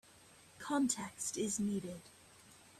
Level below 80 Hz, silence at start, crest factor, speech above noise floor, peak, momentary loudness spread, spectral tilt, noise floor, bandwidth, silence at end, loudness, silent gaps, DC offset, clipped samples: -74 dBFS; 0.15 s; 20 dB; 24 dB; -20 dBFS; 24 LU; -4 dB/octave; -62 dBFS; 15 kHz; 0 s; -38 LUFS; none; under 0.1%; under 0.1%